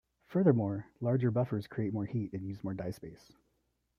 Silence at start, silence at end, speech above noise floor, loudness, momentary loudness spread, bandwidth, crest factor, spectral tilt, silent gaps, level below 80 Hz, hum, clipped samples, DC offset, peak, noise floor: 0.3 s; 0.85 s; 46 dB; -33 LUFS; 12 LU; 12 kHz; 22 dB; -10 dB/octave; none; -68 dBFS; none; under 0.1%; under 0.1%; -12 dBFS; -79 dBFS